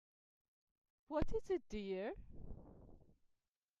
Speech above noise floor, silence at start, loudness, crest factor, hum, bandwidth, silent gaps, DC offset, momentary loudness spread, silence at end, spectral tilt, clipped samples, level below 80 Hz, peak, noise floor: 44 dB; 1.1 s; -44 LUFS; 18 dB; none; 7.6 kHz; none; under 0.1%; 18 LU; 0.8 s; -7 dB/octave; under 0.1%; -56 dBFS; -26 dBFS; -85 dBFS